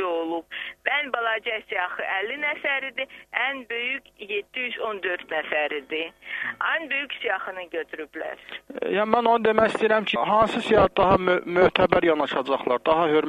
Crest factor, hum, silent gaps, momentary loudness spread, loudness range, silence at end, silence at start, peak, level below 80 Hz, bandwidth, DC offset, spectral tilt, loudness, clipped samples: 24 dB; none; none; 12 LU; 7 LU; 0 s; 0 s; 0 dBFS; -52 dBFS; 13 kHz; under 0.1%; -5.5 dB/octave; -24 LUFS; under 0.1%